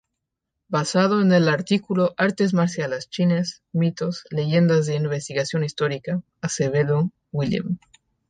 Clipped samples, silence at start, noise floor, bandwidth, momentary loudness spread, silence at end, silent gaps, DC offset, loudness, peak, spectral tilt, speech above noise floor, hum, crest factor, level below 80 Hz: under 0.1%; 0.7 s; -81 dBFS; 9.4 kHz; 9 LU; 0.5 s; none; under 0.1%; -22 LUFS; -6 dBFS; -6 dB/octave; 60 dB; none; 16 dB; -60 dBFS